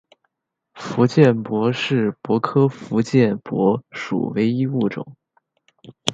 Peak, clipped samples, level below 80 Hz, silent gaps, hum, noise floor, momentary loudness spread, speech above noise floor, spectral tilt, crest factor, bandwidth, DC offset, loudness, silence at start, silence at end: 0 dBFS; under 0.1%; -62 dBFS; none; none; -77 dBFS; 10 LU; 58 dB; -7 dB/octave; 20 dB; 11.5 kHz; under 0.1%; -20 LUFS; 0.75 s; 0 s